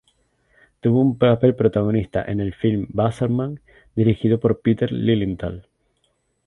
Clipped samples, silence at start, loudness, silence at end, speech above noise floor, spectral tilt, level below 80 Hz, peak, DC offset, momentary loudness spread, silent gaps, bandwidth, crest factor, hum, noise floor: under 0.1%; 0.85 s; -20 LUFS; 0.85 s; 49 dB; -9.5 dB/octave; -46 dBFS; -2 dBFS; under 0.1%; 13 LU; none; 10.5 kHz; 18 dB; none; -68 dBFS